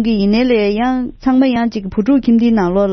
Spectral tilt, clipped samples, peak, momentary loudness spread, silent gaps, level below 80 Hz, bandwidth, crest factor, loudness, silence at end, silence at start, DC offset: -8 dB/octave; under 0.1%; -2 dBFS; 6 LU; none; -36 dBFS; 6.2 kHz; 12 dB; -14 LUFS; 0 s; 0 s; under 0.1%